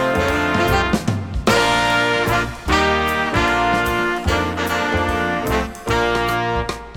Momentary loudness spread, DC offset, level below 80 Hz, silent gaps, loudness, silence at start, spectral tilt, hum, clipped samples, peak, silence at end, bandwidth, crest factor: 5 LU; under 0.1%; -32 dBFS; none; -18 LUFS; 0 s; -4.5 dB/octave; none; under 0.1%; -2 dBFS; 0 s; 19.5 kHz; 16 dB